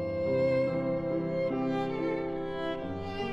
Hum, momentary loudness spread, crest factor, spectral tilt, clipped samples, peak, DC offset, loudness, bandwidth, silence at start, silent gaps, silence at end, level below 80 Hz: none; 7 LU; 14 dB; -8 dB/octave; under 0.1%; -18 dBFS; under 0.1%; -31 LUFS; 7.6 kHz; 0 s; none; 0 s; -58 dBFS